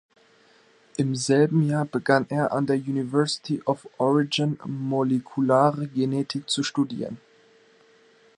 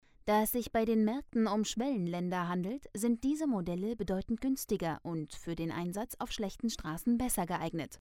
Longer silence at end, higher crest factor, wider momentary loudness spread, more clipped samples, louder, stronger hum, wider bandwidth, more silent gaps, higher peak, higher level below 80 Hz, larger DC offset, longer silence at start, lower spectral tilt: first, 1.2 s vs 0.05 s; first, 22 dB vs 16 dB; about the same, 8 LU vs 8 LU; neither; first, -24 LUFS vs -34 LUFS; neither; second, 11 kHz vs 17.5 kHz; neither; first, -4 dBFS vs -18 dBFS; second, -70 dBFS vs -54 dBFS; neither; first, 1 s vs 0.25 s; about the same, -5.5 dB/octave vs -5.5 dB/octave